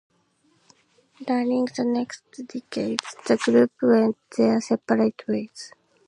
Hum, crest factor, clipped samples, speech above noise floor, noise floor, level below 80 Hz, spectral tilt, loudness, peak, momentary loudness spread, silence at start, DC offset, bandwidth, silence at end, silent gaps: none; 24 dB; under 0.1%; 42 dB; -65 dBFS; -72 dBFS; -5.5 dB/octave; -23 LUFS; -2 dBFS; 17 LU; 1.2 s; under 0.1%; 10.5 kHz; 0.4 s; none